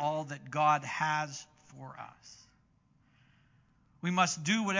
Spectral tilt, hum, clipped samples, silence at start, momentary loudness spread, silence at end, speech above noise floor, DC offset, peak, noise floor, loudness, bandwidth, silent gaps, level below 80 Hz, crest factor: -4 dB/octave; none; under 0.1%; 0 s; 23 LU; 0 s; 37 dB; under 0.1%; -12 dBFS; -69 dBFS; -31 LUFS; 7.6 kHz; none; -76 dBFS; 22 dB